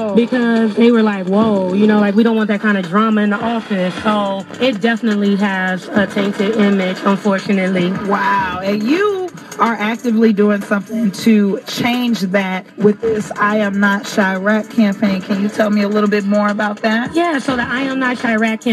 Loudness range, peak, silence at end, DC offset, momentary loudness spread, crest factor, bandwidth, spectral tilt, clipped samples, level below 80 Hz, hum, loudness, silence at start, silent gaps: 2 LU; 0 dBFS; 0 s; under 0.1%; 5 LU; 14 dB; 13 kHz; -6 dB/octave; under 0.1%; -56 dBFS; none; -15 LUFS; 0 s; none